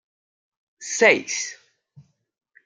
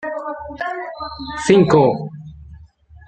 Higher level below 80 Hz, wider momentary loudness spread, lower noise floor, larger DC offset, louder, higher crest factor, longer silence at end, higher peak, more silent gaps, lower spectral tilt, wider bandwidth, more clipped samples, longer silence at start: second, -78 dBFS vs -46 dBFS; second, 16 LU vs 19 LU; first, -54 dBFS vs -45 dBFS; neither; about the same, -20 LUFS vs -18 LUFS; first, 24 dB vs 18 dB; first, 0.65 s vs 0.1 s; about the same, -2 dBFS vs -2 dBFS; neither; second, -1.5 dB/octave vs -6.5 dB/octave; first, 10 kHz vs 9 kHz; neither; first, 0.8 s vs 0 s